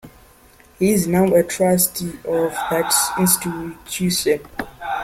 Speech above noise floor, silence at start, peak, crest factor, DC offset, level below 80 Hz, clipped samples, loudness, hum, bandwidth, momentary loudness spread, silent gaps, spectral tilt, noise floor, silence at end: 31 dB; 0.05 s; -2 dBFS; 18 dB; under 0.1%; -48 dBFS; under 0.1%; -18 LUFS; none; 16.5 kHz; 11 LU; none; -4 dB/octave; -49 dBFS; 0 s